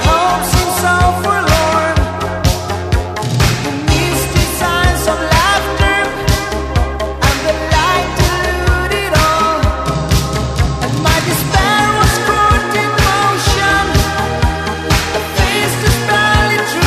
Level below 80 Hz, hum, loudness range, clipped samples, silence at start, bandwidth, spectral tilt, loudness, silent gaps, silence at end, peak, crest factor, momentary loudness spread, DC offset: -20 dBFS; none; 2 LU; under 0.1%; 0 s; 14.5 kHz; -4 dB/octave; -13 LUFS; none; 0 s; 0 dBFS; 12 dB; 5 LU; under 0.1%